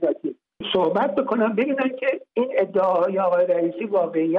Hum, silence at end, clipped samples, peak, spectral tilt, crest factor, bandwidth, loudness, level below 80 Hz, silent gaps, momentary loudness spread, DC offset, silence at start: none; 0 s; under 0.1%; -10 dBFS; -8 dB/octave; 12 dB; 4.7 kHz; -22 LUFS; -66 dBFS; none; 5 LU; under 0.1%; 0 s